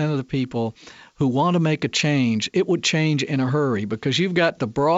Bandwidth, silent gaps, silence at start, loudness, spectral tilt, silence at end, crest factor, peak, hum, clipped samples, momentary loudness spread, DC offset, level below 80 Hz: 8 kHz; none; 0 s; -21 LUFS; -5.5 dB/octave; 0 s; 14 dB; -6 dBFS; none; under 0.1%; 5 LU; under 0.1%; -56 dBFS